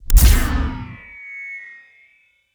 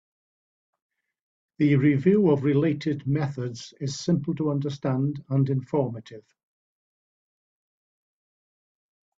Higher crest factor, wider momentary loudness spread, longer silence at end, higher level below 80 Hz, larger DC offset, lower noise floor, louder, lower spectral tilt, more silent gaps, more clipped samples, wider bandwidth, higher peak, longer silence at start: about the same, 18 dB vs 18 dB; first, 21 LU vs 12 LU; second, 0.9 s vs 3 s; first, -18 dBFS vs -64 dBFS; neither; second, -58 dBFS vs under -90 dBFS; first, -19 LUFS vs -25 LUFS; second, -4 dB/octave vs -7.5 dB/octave; neither; neither; first, over 20 kHz vs 7.8 kHz; first, 0 dBFS vs -10 dBFS; second, 0.1 s vs 1.6 s